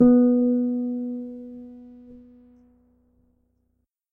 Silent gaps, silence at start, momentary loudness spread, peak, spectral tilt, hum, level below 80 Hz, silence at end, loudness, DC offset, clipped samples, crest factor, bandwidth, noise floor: none; 0 s; 27 LU; -6 dBFS; -12.5 dB/octave; none; -58 dBFS; 1.95 s; -22 LUFS; under 0.1%; under 0.1%; 18 dB; 1.6 kHz; -73 dBFS